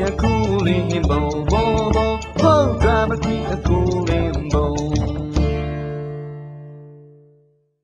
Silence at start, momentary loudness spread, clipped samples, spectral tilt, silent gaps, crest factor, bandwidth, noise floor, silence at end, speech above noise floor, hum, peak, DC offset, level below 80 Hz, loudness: 0 s; 13 LU; under 0.1%; -7 dB/octave; none; 16 dB; 8.4 kHz; -58 dBFS; 0.75 s; 39 dB; none; -2 dBFS; under 0.1%; -26 dBFS; -19 LUFS